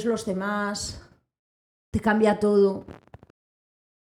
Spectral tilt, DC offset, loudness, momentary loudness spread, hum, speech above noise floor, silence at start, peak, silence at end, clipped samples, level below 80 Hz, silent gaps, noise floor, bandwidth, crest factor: -5.5 dB/octave; under 0.1%; -24 LUFS; 14 LU; none; over 66 dB; 0 s; -8 dBFS; 1.1 s; under 0.1%; -52 dBFS; 1.39-1.92 s; under -90 dBFS; 13.5 kHz; 18 dB